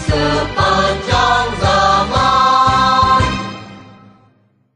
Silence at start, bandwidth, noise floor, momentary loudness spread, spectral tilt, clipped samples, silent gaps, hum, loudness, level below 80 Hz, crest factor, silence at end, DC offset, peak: 0 s; 10.5 kHz; -55 dBFS; 6 LU; -4.5 dB/octave; under 0.1%; none; none; -13 LUFS; -30 dBFS; 14 dB; 0.95 s; under 0.1%; 0 dBFS